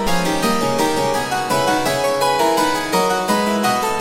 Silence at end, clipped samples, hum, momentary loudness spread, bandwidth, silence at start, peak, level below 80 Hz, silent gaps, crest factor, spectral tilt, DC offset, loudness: 0 s; under 0.1%; none; 3 LU; 17 kHz; 0 s; -4 dBFS; -42 dBFS; none; 14 dB; -3.5 dB/octave; under 0.1%; -17 LUFS